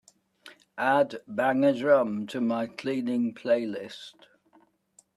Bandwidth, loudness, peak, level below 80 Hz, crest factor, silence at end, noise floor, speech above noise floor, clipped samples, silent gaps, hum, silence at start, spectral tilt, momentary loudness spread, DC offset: 12 kHz; -27 LUFS; -8 dBFS; -76 dBFS; 20 dB; 1.05 s; -63 dBFS; 37 dB; under 0.1%; none; none; 0.45 s; -6 dB/octave; 16 LU; under 0.1%